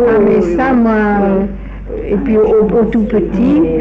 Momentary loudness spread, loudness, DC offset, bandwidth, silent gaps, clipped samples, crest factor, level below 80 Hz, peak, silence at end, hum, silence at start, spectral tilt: 10 LU; -12 LUFS; under 0.1%; 7.2 kHz; none; under 0.1%; 8 dB; -28 dBFS; -4 dBFS; 0 s; none; 0 s; -9.5 dB/octave